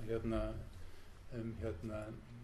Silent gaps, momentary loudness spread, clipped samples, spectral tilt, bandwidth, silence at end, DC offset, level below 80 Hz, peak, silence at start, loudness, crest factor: none; 18 LU; under 0.1%; -8 dB/octave; 13.5 kHz; 0 s; under 0.1%; -50 dBFS; -26 dBFS; 0 s; -44 LUFS; 16 dB